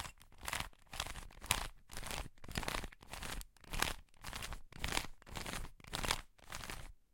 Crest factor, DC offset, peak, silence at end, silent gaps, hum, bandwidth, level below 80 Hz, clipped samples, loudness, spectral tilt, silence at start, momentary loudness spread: 32 dB; under 0.1%; -12 dBFS; 0.2 s; none; none; 17 kHz; -50 dBFS; under 0.1%; -43 LUFS; -2 dB/octave; 0 s; 11 LU